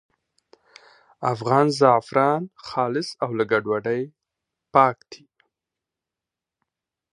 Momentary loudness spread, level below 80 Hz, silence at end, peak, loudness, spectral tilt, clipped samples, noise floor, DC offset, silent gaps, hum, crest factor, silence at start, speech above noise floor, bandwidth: 11 LU; -70 dBFS; 2 s; -2 dBFS; -22 LUFS; -6 dB/octave; under 0.1%; -88 dBFS; under 0.1%; none; none; 22 dB; 1.2 s; 67 dB; 11 kHz